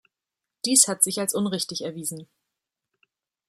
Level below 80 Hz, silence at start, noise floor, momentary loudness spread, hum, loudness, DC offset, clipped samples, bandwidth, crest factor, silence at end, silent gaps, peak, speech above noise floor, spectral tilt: -74 dBFS; 0.65 s; -87 dBFS; 15 LU; none; -22 LUFS; under 0.1%; under 0.1%; 16 kHz; 24 dB; 1.25 s; none; -4 dBFS; 63 dB; -2 dB/octave